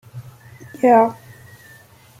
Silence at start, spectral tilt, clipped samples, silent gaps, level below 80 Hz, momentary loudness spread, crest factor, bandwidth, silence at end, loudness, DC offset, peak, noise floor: 0.15 s; -7.5 dB/octave; under 0.1%; none; -64 dBFS; 27 LU; 18 dB; 16 kHz; 1.05 s; -16 LUFS; under 0.1%; -2 dBFS; -47 dBFS